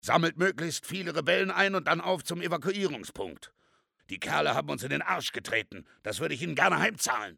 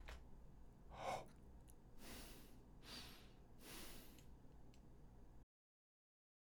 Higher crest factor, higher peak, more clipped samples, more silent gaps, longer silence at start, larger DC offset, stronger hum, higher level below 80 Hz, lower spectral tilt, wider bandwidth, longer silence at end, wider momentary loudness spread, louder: about the same, 22 dB vs 22 dB; first, -8 dBFS vs -36 dBFS; neither; neither; about the same, 0.05 s vs 0 s; neither; neither; about the same, -68 dBFS vs -64 dBFS; about the same, -3.5 dB/octave vs -3.5 dB/octave; about the same, 19 kHz vs over 20 kHz; second, 0.05 s vs 1 s; about the same, 14 LU vs 15 LU; first, -29 LUFS vs -58 LUFS